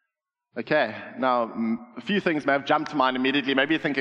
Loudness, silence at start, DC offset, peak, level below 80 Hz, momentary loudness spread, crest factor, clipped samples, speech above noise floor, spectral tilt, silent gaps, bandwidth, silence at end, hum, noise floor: -24 LUFS; 0.55 s; under 0.1%; -6 dBFS; -72 dBFS; 7 LU; 20 dB; under 0.1%; 59 dB; -6 dB/octave; none; 7.8 kHz; 0 s; none; -84 dBFS